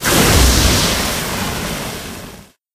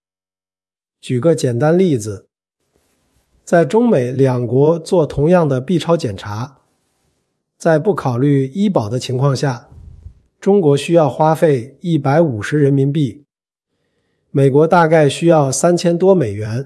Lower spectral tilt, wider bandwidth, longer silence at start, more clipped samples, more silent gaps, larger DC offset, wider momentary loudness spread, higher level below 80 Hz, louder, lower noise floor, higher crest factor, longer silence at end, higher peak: second, -3 dB/octave vs -7 dB/octave; first, 15.5 kHz vs 12 kHz; second, 0 s vs 1.05 s; neither; neither; neither; first, 18 LU vs 9 LU; first, -22 dBFS vs -50 dBFS; about the same, -14 LUFS vs -15 LUFS; second, -37 dBFS vs under -90 dBFS; about the same, 16 dB vs 16 dB; first, 0.3 s vs 0 s; about the same, 0 dBFS vs 0 dBFS